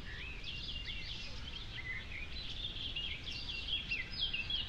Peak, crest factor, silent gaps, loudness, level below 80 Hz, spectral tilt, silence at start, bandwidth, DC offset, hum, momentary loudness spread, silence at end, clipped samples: -24 dBFS; 16 dB; none; -40 LUFS; -50 dBFS; -3 dB/octave; 0 s; 10.5 kHz; under 0.1%; none; 8 LU; 0 s; under 0.1%